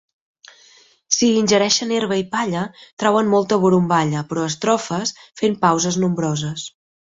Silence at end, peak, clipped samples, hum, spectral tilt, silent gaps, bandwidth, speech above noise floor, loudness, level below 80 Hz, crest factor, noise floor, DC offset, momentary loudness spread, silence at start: 0.45 s; -2 dBFS; under 0.1%; none; -4.5 dB/octave; 2.93-2.97 s; 8 kHz; 33 dB; -19 LUFS; -58 dBFS; 18 dB; -52 dBFS; under 0.1%; 9 LU; 1.1 s